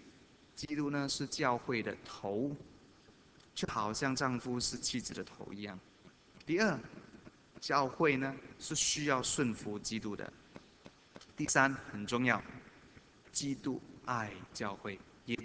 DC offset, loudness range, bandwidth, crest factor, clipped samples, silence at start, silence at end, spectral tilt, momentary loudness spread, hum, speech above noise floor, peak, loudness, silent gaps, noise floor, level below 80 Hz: under 0.1%; 4 LU; 8 kHz; 26 dB; under 0.1%; 0 s; 0 s; -3.5 dB/octave; 18 LU; none; 26 dB; -12 dBFS; -36 LUFS; none; -62 dBFS; -66 dBFS